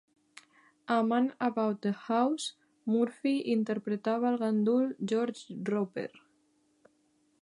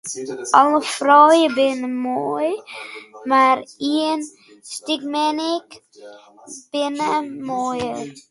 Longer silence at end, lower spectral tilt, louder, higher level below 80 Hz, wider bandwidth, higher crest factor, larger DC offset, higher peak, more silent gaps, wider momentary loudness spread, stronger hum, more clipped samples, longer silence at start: first, 1.35 s vs 0.1 s; first, -6 dB/octave vs -3 dB/octave; second, -31 LUFS vs -19 LUFS; second, -86 dBFS vs -66 dBFS; about the same, 11 kHz vs 11.5 kHz; about the same, 16 dB vs 20 dB; neither; second, -14 dBFS vs 0 dBFS; neither; second, 10 LU vs 18 LU; neither; neither; first, 0.9 s vs 0.05 s